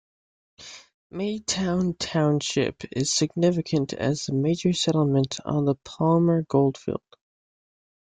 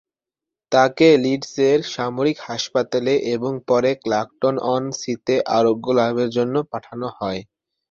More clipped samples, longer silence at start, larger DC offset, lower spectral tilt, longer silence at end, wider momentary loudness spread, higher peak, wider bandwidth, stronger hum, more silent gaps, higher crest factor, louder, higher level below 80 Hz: neither; about the same, 0.6 s vs 0.7 s; neither; about the same, -5.5 dB/octave vs -5 dB/octave; first, 1.2 s vs 0.5 s; about the same, 10 LU vs 10 LU; second, -8 dBFS vs -2 dBFS; first, 9.6 kHz vs 7.4 kHz; neither; first, 0.94-1.10 s vs none; about the same, 18 dB vs 18 dB; second, -24 LUFS vs -20 LUFS; about the same, -58 dBFS vs -60 dBFS